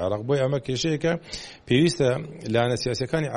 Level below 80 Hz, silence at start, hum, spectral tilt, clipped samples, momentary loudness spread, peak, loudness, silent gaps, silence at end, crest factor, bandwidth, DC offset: -50 dBFS; 0 s; none; -5.5 dB/octave; under 0.1%; 9 LU; -6 dBFS; -24 LUFS; none; 0 s; 18 dB; 11.5 kHz; under 0.1%